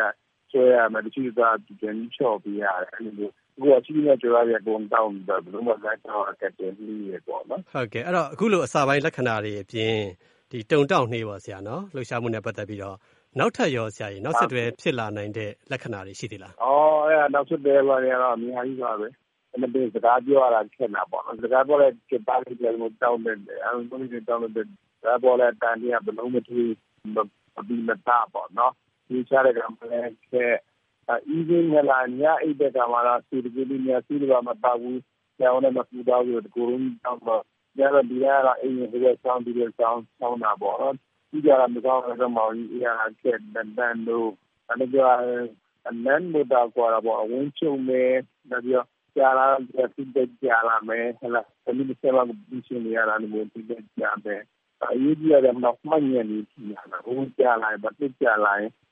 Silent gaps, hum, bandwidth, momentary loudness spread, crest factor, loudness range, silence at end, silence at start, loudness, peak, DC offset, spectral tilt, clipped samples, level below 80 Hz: none; none; 10 kHz; 14 LU; 18 dB; 4 LU; 0.25 s; 0 s; -24 LUFS; -6 dBFS; under 0.1%; -6.5 dB/octave; under 0.1%; -72 dBFS